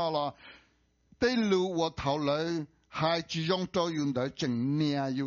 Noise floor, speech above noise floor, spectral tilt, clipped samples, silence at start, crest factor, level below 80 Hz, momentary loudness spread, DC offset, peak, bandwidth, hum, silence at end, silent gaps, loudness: -69 dBFS; 39 dB; -4.5 dB/octave; under 0.1%; 0 s; 18 dB; -60 dBFS; 5 LU; under 0.1%; -14 dBFS; 7.2 kHz; none; 0 s; none; -30 LUFS